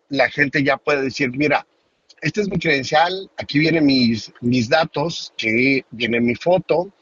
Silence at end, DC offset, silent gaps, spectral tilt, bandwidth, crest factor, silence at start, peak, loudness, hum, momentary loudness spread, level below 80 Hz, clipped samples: 0.15 s; under 0.1%; none; -5.5 dB/octave; 7.6 kHz; 18 dB; 0.1 s; 0 dBFS; -19 LUFS; none; 7 LU; -54 dBFS; under 0.1%